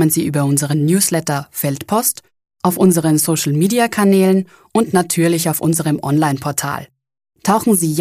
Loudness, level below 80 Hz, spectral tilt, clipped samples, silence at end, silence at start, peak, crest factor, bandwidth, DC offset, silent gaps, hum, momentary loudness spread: -16 LUFS; -56 dBFS; -5 dB/octave; under 0.1%; 0 s; 0 s; -2 dBFS; 14 dB; 15.5 kHz; under 0.1%; none; none; 8 LU